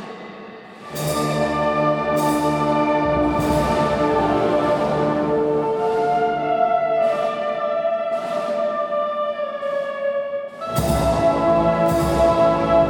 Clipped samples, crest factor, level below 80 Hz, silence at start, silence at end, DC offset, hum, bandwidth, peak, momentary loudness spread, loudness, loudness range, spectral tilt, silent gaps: under 0.1%; 16 dB; -38 dBFS; 0 s; 0 s; under 0.1%; none; 19.5 kHz; -4 dBFS; 8 LU; -20 LUFS; 4 LU; -6 dB/octave; none